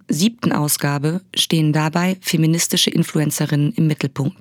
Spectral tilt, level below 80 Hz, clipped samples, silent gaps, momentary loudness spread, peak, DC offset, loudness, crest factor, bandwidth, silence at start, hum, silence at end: -4.5 dB/octave; -66 dBFS; under 0.1%; none; 4 LU; 0 dBFS; under 0.1%; -18 LUFS; 18 dB; 19.5 kHz; 0.1 s; none; 0.1 s